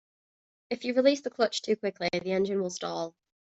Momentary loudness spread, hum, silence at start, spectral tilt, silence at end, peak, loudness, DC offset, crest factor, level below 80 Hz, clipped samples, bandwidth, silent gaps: 10 LU; none; 0.7 s; -4.5 dB/octave; 0.35 s; -10 dBFS; -29 LUFS; under 0.1%; 20 dB; -72 dBFS; under 0.1%; 8.2 kHz; none